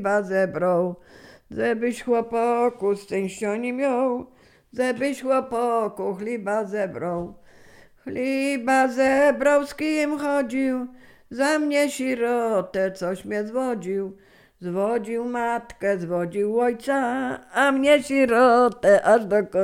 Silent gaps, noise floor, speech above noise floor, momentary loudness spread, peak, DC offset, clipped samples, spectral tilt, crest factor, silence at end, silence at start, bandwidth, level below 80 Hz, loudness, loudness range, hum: none; -50 dBFS; 28 dB; 11 LU; -4 dBFS; under 0.1%; under 0.1%; -5 dB/octave; 18 dB; 0 s; 0 s; 16 kHz; -60 dBFS; -23 LUFS; 6 LU; none